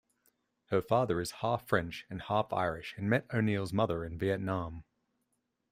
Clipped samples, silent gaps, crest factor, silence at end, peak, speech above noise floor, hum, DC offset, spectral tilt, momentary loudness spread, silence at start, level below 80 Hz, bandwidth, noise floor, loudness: under 0.1%; none; 22 dB; 0.9 s; -12 dBFS; 49 dB; none; under 0.1%; -6.5 dB/octave; 7 LU; 0.7 s; -60 dBFS; 15.5 kHz; -81 dBFS; -33 LUFS